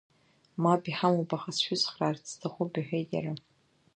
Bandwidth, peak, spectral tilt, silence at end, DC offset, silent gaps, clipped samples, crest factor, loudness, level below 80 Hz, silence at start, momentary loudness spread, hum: 9.6 kHz; -10 dBFS; -5 dB/octave; 0.55 s; under 0.1%; none; under 0.1%; 20 dB; -30 LUFS; -74 dBFS; 0.55 s; 11 LU; none